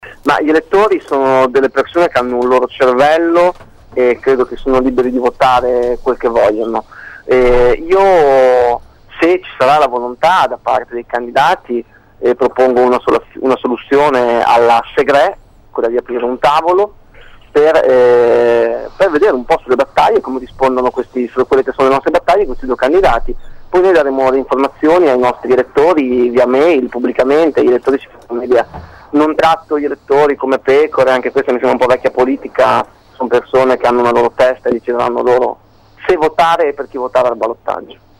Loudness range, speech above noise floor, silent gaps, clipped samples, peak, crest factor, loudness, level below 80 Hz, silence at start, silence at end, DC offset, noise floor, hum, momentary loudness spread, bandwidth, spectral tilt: 2 LU; 26 dB; none; under 0.1%; -2 dBFS; 10 dB; -12 LUFS; -34 dBFS; 0.05 s; 0.25 s; under 0.1%; -38 dBFS; none; 8 LU; 12.5 kHz; -5.5 dB/octave